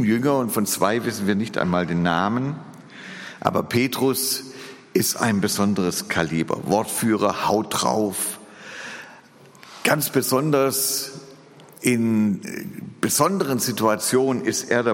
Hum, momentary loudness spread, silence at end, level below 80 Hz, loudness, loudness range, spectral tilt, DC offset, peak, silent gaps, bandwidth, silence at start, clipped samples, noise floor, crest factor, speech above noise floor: none; 16 LU; 0 s; -60 dBFS; -22 LUFS; 2 LU; -4 dB/octave; under 0.1%; -2 dBFS; none; 17 kHz; 0 s; under 0.1%; -48 dBFS; 20 dB; 27 dB